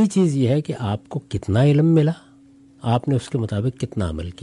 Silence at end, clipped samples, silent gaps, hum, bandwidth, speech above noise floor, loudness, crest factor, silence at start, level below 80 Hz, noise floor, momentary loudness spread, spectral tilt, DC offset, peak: 0.1 s; under 0.1%; none; none; 11.5 kHz; 30 dB; -21 LUFS; 14 dB; 0 s; -44 dBFS; -50 dBFS; 12 LU; -7.5 dB/octave; under 0.1%; -6 dBFS